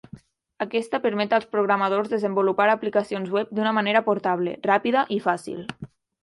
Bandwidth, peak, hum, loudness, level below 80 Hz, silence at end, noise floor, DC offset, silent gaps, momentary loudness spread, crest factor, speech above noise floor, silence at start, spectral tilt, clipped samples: 11.5 kHz; -6 dBFS; none; -23 LUFS; -68 dBFS; 0.35 s; -47 dBFS; under 0.1%; none; 10 LU; 16 dB; 24 dB; 0.15 s; -6 dB/octave; under 0.1%